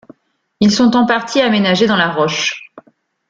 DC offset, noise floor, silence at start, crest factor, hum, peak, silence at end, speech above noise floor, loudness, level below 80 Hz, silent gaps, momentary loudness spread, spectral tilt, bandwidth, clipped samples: under 0.1%; -51 dBFS; 0.6 s; 14 dB; none; -2 dBFS; 0.5 s; 39 dB; -13 LUFS; -54 dBFS; none; 6 LU; -4.5 dB/octave; 7.6 kHz; under 0.1%